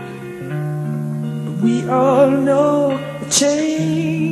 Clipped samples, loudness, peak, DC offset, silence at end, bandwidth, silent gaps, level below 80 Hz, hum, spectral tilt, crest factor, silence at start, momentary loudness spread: under 0.1%; -17 LUFS; 0 dBFS; under 0.1%; 0 s; 13 kHz; none; -56 dBFS; none; -5 dB/octave; 16 dB; 0 s; 11 LU